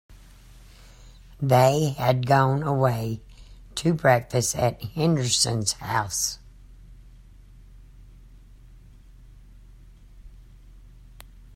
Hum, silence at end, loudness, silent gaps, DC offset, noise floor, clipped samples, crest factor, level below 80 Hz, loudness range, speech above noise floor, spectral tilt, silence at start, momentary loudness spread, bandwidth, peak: none; 0.35 s; -23 LUFS; none; under 0.1%; -48 dBFS; under 0.1%; 20 dB; -48 dBFS; 9 LU; 26 dB; -4.5 dB/octave; 0.1 s; 10 LU; 16 kHz; -6 dBFS